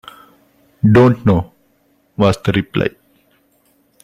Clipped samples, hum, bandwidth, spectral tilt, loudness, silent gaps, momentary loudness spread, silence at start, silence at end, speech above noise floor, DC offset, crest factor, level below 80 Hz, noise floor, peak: under 0.1%; none; 13 kHz; -8 dB/octave; -15 LUFS; none; 12 LU; 0.85 s; 1.15 s; 45 dB; under 0.1%; 16 dB; -44 dBFS; -58 dBFS; 0 dBFS